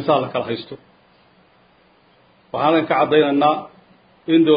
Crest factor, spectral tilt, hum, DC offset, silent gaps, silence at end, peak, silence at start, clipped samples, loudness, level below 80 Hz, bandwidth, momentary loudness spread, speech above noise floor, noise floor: 18 dB; -11 dB/octave; none; under 0.1%; none; 0 s; -2 dBFS; 0 s; under 0.1%; -18 LUFS; -64 dBFS; 5.2 kHz; 18 LU; 38 dB; -55 dBFS